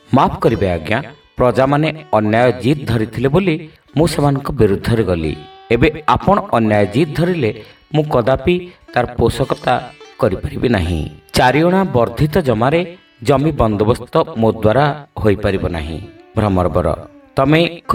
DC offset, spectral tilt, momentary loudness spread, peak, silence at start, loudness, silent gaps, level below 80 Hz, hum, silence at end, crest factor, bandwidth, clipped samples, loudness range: under 0.1%; -7 dB/octave; 8 LU; 0 dBFS; 0.1 s; -16 LUFS; none; -34 dBFS; none; 0 s; 16 dB; 16.5 kHz; under 0.1%; 2 LU